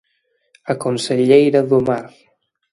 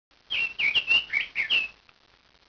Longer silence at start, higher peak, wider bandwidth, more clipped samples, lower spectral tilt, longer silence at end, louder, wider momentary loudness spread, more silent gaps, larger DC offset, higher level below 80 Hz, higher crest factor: first, 0.65 s vs 0.3 s; first, 0 dBFS vs -12 dBFS; first, 11.5 kHz vs 5.4 kHz; neither; first, -6 dB/octave vs -0.5 dB/octave; about the same, 0.65 s vs 0.75 s; first, -16 LUFS vs -24 LUFS; first, 13 LU vs 8 LU; neither; neither; first, -58 dBFS vs -64 dBFS; about the same, 18 dB vs 16 dB